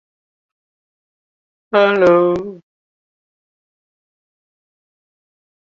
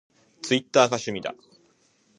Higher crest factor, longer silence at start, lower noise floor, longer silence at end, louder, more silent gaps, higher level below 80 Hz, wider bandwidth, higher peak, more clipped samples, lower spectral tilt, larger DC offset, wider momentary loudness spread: about the same, 20 dB vs 24 dB; first, 1.75 s vs 0.45 s; first, under -90 dBFS vs -64 dBFS; first, 3.2 s vs 0.85 s; first, -14 LUFS vs -23 LUFS; neither; first, -60 dBFS vs -68 dBFS; second, 7.2 kHz vs 10.5 kHz; about the same, -2 dBFS vs -2 dBFS; neither; first, -7 dB/octave vs -3.5 dB/octave; neither; second, 12 LU vs 16 LU